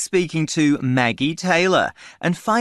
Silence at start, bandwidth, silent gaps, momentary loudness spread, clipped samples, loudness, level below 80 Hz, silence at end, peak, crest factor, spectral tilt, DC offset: 0 s; 12 kHz; none; 8 LU; under 0.1%; -19 LUFS; -58 dBFS; 0 s; -2 dBFS; 16 dB; -5 dB/octave; under 0.1%